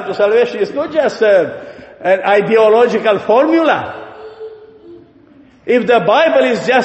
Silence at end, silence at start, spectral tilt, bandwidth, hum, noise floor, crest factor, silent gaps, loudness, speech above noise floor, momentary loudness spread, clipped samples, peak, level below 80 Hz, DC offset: 0 s; 0 s; -5.5 dB/octave; 8.4 kHz; none; -44 dBFS; 12 dB; none; -12 LUFS; 32 dB; 21 LU; under 0.1%; 0 dBFS; -58 dBFS; under 0.1%